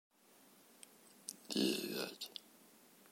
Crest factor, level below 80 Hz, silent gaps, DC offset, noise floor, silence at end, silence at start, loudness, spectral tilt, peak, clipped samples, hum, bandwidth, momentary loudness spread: 24 dB; under -90 dBFS; none; under 0.1%; -67 dBFS; 0.7 s; 1.05 s; -41 LUFS; -3 dB/octave; -22 dBFS; under 0.1%; none; 16.5 kHz; 26 LU